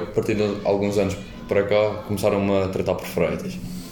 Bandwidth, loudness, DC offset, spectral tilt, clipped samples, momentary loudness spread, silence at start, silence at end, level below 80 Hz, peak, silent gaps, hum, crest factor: 18 kHz; -23 LUFS; under 0.1%; -6.5 dB/octave; under 0.1%; 8 LU; 0 s; 0 s; -46 dBFS; -6 dBFS; none; none; 16 dB